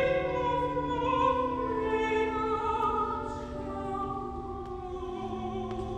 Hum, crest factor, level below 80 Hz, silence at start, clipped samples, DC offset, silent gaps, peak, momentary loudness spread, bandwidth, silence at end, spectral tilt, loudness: none; 16 dB; -46 dBFS; 0 s; under 0.1%; under 0.1%; none; -16 dBFS; 10 LU; 9.4 kHz; 0 s; -6.5 dB/octave; -31 LUFS